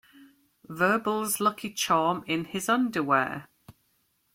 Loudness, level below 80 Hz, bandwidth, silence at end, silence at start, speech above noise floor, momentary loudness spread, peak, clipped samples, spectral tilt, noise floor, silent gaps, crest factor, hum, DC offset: -26 LUFS; -70 dBFS; 16.5 kHz; 0.65 s; 0.2 s; 44 dB; 7 LU; -10 dBFS; under 0.1%; -3.5 dB/octave; -71 dBFS; none; 18 dB; none; under 0.1%